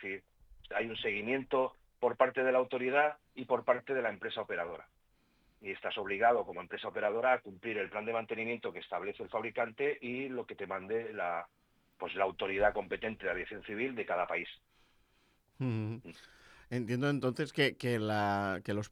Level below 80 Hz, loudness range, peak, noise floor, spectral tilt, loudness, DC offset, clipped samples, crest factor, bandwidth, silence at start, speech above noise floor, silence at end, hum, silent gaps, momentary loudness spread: -66 dBFS; 6 LU; -12 dBFS; -72 dBFS; -6 dB/octave; -35 LUFS; under 0.1%; under 0.1%; 24 dB; 14.5 kHz; 0 s; 37 dB; 0.05 s; none; none; 11 LU